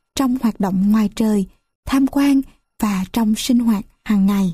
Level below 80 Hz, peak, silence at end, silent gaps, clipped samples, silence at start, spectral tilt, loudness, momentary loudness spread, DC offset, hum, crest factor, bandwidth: -42 dBFS; -4 dBFS; 0 s; 1.75-1.83 s; under 0.1%; 0.15 s; -6 dB/octave; -18 LUFS; 7 LU; under 0.1%; none; 12 dB; 15.5 kHz